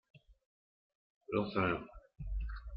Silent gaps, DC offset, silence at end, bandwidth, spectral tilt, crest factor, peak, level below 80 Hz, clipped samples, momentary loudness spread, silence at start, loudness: 0.46-1.21 s; under 0.1%; 0 s; 5.4 kHz; -9.5 dB/octave; 22 dB; -18 dBFS; -48 dBFS; under 0.1%; 15 LU; 0.15 s; -38 LUFS